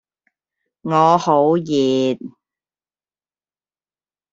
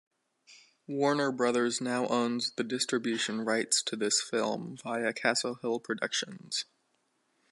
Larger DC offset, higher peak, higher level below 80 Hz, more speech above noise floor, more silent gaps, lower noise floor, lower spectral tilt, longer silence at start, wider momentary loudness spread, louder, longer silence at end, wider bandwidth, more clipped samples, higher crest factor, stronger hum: neither; first, -2 dBFS vs -12 dBFS; first, -64 dBFS vs -84 dBFS; first, over 74 dB vs 44 dB; neither; first, under -90 dBFS vs -75 dBFS; first, -6.5 dB/octave vs -2.5 dB/octave; first, 0.85 s vs 0.5 s; first, 16 LU vs 7 LU; first, -16 LUFS vs -30 LUFS; first, 2.05 s vs 0.9 s; second, 7.8 kHz vs 11.5 kHz; neither; about the same, 18 dB vs 20 dB; neither